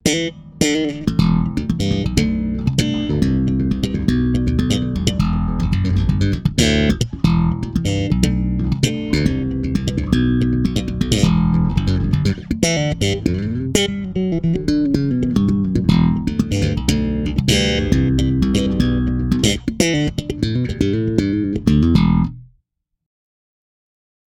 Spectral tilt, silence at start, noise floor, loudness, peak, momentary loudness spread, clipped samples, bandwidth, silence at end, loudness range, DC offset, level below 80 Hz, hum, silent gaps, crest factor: -6 dB/octave; 0.05 s; -69 dBFS; -18 LUFS; 0 dBFS; 5 LU; under 0.1%; 16 kHz; 1.85 s; 2 LU; under 0.1%; -28 dBFS; none; none; 16 dB